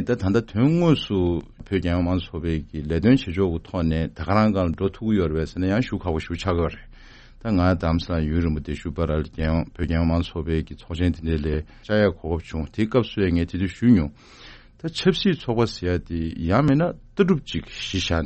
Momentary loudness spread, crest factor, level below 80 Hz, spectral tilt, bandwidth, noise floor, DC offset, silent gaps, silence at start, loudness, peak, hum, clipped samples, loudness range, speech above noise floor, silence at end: 9 LU; 18 dB; -38 dBFS; -7.5 dB/octave; 8.4 kHz; -46 dBFS; under 0.1%; none; 0 s; -23 LUFS; -4 dBFS; none; under 0.1%; 2 LU; 23 dB; 0 s